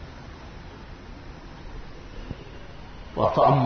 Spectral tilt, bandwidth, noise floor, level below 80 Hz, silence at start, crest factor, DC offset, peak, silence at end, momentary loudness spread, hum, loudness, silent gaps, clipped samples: -8 dB/octave; 6.4 kHz; -41 dBFS; -44 dBFS; 0 s; 22 dB; under 0.1%; -6 dBFS; 0 s; 20 LU; none; -25 LUFS; none; under 0.1%